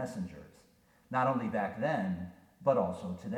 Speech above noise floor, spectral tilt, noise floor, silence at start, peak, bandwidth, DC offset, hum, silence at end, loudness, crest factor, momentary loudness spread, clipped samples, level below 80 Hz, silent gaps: 33 dB; -7.5 dB/octave; -65 dBFS; 0 s; -16 dBFS; 14 kHz; under 0.1%; none; 0 s; -34 LUFS; 20 dB; 13 LU; under 0.1%; -66 dBFS; none